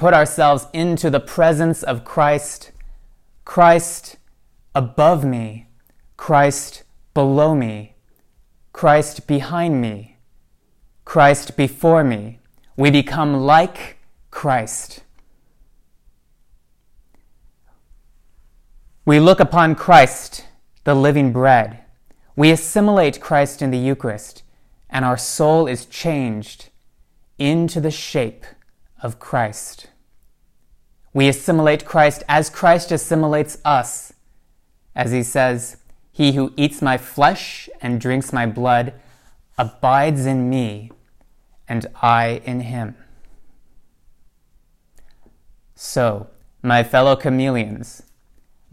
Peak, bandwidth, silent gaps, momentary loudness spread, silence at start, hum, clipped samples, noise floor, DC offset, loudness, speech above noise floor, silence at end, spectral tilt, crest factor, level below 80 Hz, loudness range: 0 dBFS; 16 kHz; none; 17 LU; 0 s; none; under 0.1%; -56 dBFS; under 0.1%; -17 LUFS; 39 dB; 0.8 s; -5.5 dB/octave; 18 dB; -48 dBFS; 8 LU